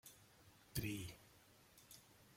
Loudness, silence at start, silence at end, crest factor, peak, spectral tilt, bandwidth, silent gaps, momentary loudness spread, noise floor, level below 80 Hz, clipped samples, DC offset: -50 LUFS; 0.05 s; 0 s; 26 dB; -26 dBFS; -4.5 dB/octave; 16.5 kHz; none; 21 LU; -69 dBFS; -68 dBFS; under 0.1%; under 0.1%